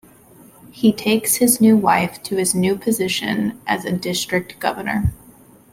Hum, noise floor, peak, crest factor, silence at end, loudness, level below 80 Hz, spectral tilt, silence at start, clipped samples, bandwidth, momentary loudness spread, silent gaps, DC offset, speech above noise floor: none; -47 dBFS; -2 dBFS; 18 dB; 0.6 s; -18 LUFS; -42 dBFS; -4 dB/octave; 0.65 s; under 0.1%; 16.5 kHz; 9 LU; none; under 0.1%; 29 dB